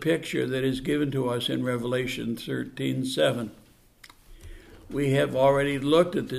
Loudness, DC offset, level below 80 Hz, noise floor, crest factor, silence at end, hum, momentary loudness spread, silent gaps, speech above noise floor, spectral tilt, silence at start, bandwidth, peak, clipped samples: -26 LUFS; under 0.1%; -52 dBFS; -54 dBFS; 18 dB; 0 s; none; 10 LU; none; 29 dB; -6 dB/octave; 0 s; 15.5 kHz; -8 dBFS; under 0.1%